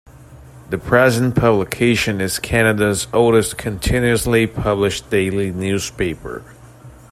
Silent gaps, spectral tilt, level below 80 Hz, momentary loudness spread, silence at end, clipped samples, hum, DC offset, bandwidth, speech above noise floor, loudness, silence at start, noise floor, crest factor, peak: none; -5 dB/octave; -36 dBFS; 9 LU; 0.2 s; under 0.1%; none; under 0.1%; 16 kHz; 24 dB; -17 LUFS; 0.2 s; -41 dBFS; 16 dB; 0 dBFS